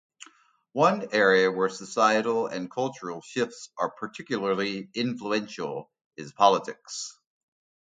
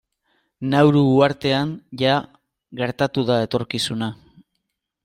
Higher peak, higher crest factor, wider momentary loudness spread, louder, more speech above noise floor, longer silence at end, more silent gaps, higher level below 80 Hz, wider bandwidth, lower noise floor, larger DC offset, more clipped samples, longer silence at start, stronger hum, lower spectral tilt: about the same, -4 dBFS vs -2 dBFS; about the same, 22 dB vs 20 dB; first, 15 LU vs 12 LU; second, -26 LUFS vs -20 LUFS; second, 32 dB vs 58 dB; second, 0.7 s vs 0.9 s; first, 6.06-6.11 s vs none; second, -74 dBFS vs -58 dBFS; second, 9.4 kHz vs 14.5 kHz; second, -58 dBFS vs -77 dBFS; neither; neither; second, 0.2 s vs 0.6 s; neither; second, -4 dB/octave vs -6 dB/octave